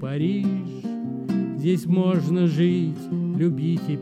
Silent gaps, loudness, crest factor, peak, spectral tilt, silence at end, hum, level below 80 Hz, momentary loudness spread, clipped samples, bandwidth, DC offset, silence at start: none; -23 LUFS; 12 dB; -10 dBFS; -8.5 dB/octave; 0 s; none; -68 dBFS; 9 LU; under 0.1%; 11.5 kHz; under 0.1%; 0 s